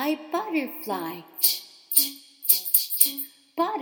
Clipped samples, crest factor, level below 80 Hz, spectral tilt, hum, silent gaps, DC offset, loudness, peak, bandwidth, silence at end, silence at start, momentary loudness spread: under 0.1%; 24 dB; -80 dBFS; -0.5 dB/octave; none; none; under 0.1%; -23 LUFS; -2 dBFS; over 20 kHz; 0 s; 0 s; 13 LU